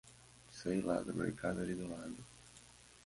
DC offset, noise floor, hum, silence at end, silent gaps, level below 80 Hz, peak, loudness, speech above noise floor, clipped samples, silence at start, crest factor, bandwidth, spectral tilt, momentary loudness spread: under 0.1%; -61 dBFS; none; 0 s; none; -64 dBFS; -24 dBFS; -40 LUFS; 22 dB; under 0.1%; 0.05 s; 18 dB; 11.5 kHz; -6 dB/octave; 21 LU